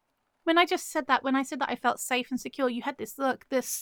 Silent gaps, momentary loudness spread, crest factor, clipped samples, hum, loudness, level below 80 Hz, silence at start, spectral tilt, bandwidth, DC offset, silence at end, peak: none; 9 LU; 22 dB; under 0.1%; none; -28 LUFS; -74 dBFS; 0.45 s; -2 dB/octave; over 20 kHz; under 0.1%; 0 s; -8 dBFS